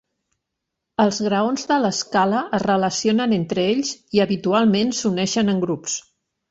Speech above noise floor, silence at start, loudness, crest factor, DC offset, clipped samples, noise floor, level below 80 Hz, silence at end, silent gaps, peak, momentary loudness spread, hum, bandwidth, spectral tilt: 61 dB; 1 s; -20 LUFS; 16 dB; under 0.1%; under 0.1%; -81 dBFS; -58 dBFS; 0.5 s; none; -4 dBFS; 5 LU; none; 8 kHz; -4.5 dB/octave